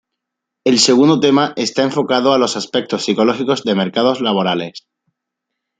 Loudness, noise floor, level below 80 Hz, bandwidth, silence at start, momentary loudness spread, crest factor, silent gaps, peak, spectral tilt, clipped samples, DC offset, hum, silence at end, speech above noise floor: -15 LUFS; -80 dBFS; -62 dBFS; 9.4 kHz; 0.65 s; 8 LU; 16 dB; none; 0 dBFS; -4 dB/octave; under 0.1%; under 0.1%; none; 1 s; 65 dB